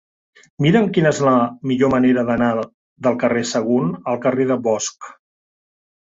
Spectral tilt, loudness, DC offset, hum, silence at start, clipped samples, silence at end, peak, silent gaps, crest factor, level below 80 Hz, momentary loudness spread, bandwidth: -6 dB/octave; -18 LUFS; under 0.1%; none; 0.6 s; under 0.1%; 0.95 s; -2 dBFS; 2.74-2.96 s; 16 dB; -54 dBFS; 7 LU; 7.8 kHz